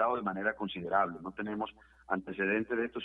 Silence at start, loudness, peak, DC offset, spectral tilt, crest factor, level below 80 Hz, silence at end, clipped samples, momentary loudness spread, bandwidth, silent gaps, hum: 0 s; -34 LUFS; -16 dBFS; under 0.1%; -8 dB/octave; 18 dB; -66 dBFS; 0 s; under 0.1%; 8 LU; 4.6 kHz; none; none